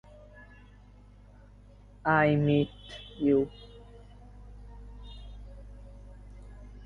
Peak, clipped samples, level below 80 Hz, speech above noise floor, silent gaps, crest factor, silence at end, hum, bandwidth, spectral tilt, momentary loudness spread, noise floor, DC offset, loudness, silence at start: -12 dBFS; under 0.1%; -50 dBFS; 27 dB; none; 22 dB; 0 s; 50 Hz at -50 dBFS; 6.8 kHz; -8.5 dB/octave; 28 LU; -53 dBFS; under 0.1%; -27 LUFS; 2.05 s